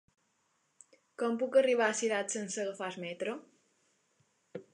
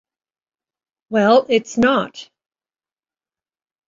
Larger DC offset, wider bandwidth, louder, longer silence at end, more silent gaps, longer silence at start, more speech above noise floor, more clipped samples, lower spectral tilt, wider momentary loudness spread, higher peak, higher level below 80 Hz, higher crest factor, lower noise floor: neither; first, 11 kHz vs 7.6 kHz; second, -32 LUFS vs -16 LUFS; second, 0.1 s vs 1.65 s; neither; about the same, 1.2 s vs 1.1 s; second, 44 dB vs over 74 dB; neither; second, -3 dB/octave vs -5 dB/octave; first, 15 LU vs 8 LU; second, -14 dBFS vs -2 dBFS; second, -90 dBFS vs -58 dBFS; about the same, 20 dB vs 18 dB; second, -76 dBFS vs under -90 dBFS